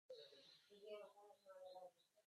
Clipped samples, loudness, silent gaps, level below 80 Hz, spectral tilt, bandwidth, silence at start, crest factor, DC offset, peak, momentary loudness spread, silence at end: under 0.1%; -62 LUFS; none; under -90 dBFS; -2.5 dB/octave; 13 kHz; 0.1 s; 18 dB; under 0.1%; -44 dBFS; 8 LU; 0.05 s